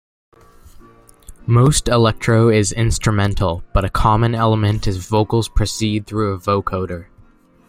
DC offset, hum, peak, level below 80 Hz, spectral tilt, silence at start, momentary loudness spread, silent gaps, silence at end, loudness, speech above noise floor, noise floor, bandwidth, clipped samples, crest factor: under 0.1%; none; -2 dBFS; -28 dBFS; -5.5 dB/octave; 1.3 s; 8 LU; none; 0.65 s; -17 LUFS; 33 dB; -49 dBFS; 15.5 kHz; under 0.1%; 16 dB